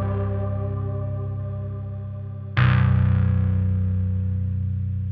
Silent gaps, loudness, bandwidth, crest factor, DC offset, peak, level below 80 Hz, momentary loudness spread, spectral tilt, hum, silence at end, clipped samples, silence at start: none; -24 LUFS; 4.7 kHz; 16 dB; under 0.1%; -6 dBFS; -38 dBFS; 12 LU; -7.5 dB/octave; none; 0 s; under 0.1%; 0 s